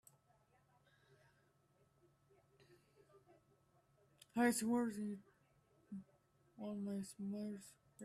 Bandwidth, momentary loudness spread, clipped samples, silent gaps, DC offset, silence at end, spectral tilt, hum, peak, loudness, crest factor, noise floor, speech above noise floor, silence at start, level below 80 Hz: 14 kHz; 19 LU; under 0.1%; none; under 0.1%; 0 s; -5 dB/octave; none; -24 dBFS; -42 LUFS; 24 dB; -76 dBFS; 35 dB; 2.7 s; -84 dBFS